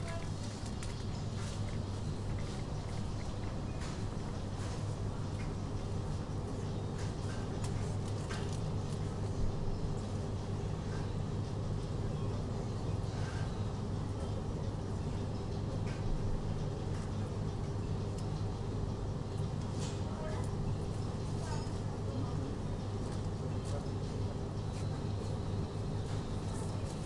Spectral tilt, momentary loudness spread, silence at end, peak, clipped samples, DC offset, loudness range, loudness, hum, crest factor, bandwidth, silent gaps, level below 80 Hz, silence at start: -6.5 dB/octave; 2 LU; 0 s; -24 dBFS; under 0.1%; under 0.1%; 2 LU; -39 LUFS; none; 14 dB; 11.5 kHz; none; -44 dBFS; 0 s